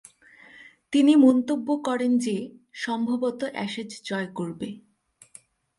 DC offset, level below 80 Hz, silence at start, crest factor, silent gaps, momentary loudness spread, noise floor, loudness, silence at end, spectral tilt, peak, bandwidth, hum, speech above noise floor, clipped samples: under 0.1%; -72 dBFS; 0.6 s; 18 dB; none; 16 LU; -54 dBFS; -24 LUFS; 1 s; -5.5 dB/octave; -6 dBFS; 11.5 kHz; none; 30 dB; under 0.1%